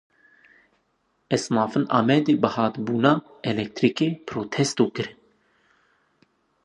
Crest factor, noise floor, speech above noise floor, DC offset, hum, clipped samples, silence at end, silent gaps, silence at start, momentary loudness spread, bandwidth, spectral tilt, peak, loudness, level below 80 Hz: 22 dB; -70 dBFS; 48 dB; under 0.1%; none; under 0.1%; 1.55 s; none; 1.3 s; 9 LU; 11 kHz; -5.5 dB/octave; -4 dBFS; -23 LUFS; -66 dBFS